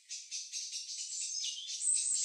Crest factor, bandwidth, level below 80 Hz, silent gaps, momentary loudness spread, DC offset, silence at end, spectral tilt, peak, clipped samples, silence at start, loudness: 18 dB; 14.5 kHz; under -90 dBFS; none; 10 LU; under 0.1%; 0 s; 12 dB/octave; -20 dBFS; under 0.1%; 0.1 s; -35 LUFS